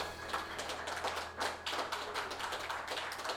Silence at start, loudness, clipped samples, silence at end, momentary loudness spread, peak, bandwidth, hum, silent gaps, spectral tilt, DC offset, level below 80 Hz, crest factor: 0 s; -39 LUFS; under 0.1%; 0 s; 2 LU; -22 dBFS; over 20 kHz; none; none; -1.5 dB/octave; under 0.1%; -62 dBFS; 18 dB